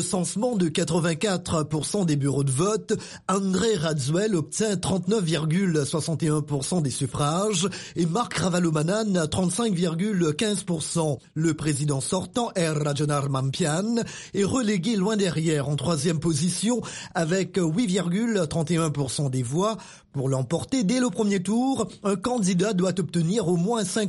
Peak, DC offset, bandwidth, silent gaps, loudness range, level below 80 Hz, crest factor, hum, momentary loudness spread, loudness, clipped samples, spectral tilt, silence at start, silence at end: -10 dBFS; under 0.1%; 11.5 kHz; none; 1 LU; -54 dBFS; 14 dB; none; 4 LU; -25 LUFS; under 0.1%; -5.5 dB/octave; 0 s; 0 s